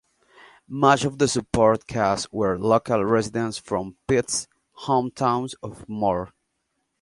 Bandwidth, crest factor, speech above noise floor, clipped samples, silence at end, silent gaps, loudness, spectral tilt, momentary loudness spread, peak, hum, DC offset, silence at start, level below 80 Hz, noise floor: 11.5 kHz; 22 dB; 53 dB; under 0.1%; 0.75 s; none; -23 LUFS; -5 dB/octave; 14 LU; -2 dBFS; none; under 0.1%; 0.7 s; -50 dBFS; -75 dBFS